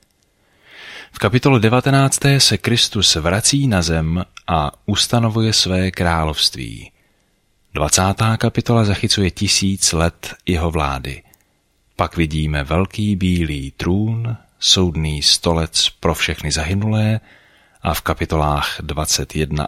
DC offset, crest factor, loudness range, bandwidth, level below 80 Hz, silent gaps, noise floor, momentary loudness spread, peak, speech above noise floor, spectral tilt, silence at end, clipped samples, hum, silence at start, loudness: under 0.1%; 18 dB; 6 LU; 16 kHz; -32 dBFS; none; -61 dBFS; 10 LU; 0 dBFS; 44 dB; -4 dB/octave; 0 s; under 0.1%; none; 0.75 s; -17 LUFS